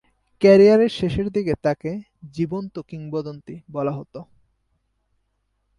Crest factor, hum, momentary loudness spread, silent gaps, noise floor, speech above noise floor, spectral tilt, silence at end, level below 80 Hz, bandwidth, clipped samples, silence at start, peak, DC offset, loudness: 18 dB; none; 22 LU; none; -71 dBFS; 51 dB; -7.5 dB/octave; 1.55 s; -50 dBFS; 10.5 kHz; under 0.1%; 0.4 s; -4 dBFS; under 0.1%; -20 LUFS